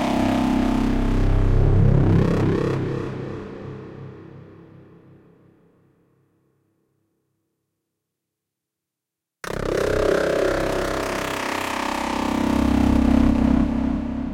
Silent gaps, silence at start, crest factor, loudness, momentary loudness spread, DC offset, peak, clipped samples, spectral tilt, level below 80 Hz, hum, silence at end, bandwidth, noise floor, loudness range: none; 0 s; 18 dB; -21 LUFS; 16 LU; under 0.1%; -4 dBFS; under 0.1%; -7 dB/octave; -30 dBFS; none; 0 s; 16.5 kHz; -85 dBFS; 16 LU